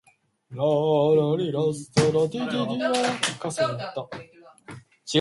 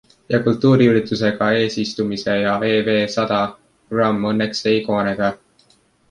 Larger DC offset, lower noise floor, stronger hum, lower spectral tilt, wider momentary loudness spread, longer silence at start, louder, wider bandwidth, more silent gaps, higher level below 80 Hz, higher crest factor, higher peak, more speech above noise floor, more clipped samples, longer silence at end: neither; second, -45 dBFS vs -57 dBFS; neither; about the same, -5 dB/octave vs -6 dB/octave; first, 20 LU vs 7 LU; first, 0.5 s vs 0.3 s; second, -24 LUFS vs -18 LUFS; about the same, 11.5 kHz vs 10.5 kHz; neither; second, -62 dBFS vs -54 dBFS; about the same, 18 dB vs 16 dB; second, -6 dBFS vs -2 dBFS; second, 22 dB vs 40 dB; neither; second, 0 s vs 0.75 s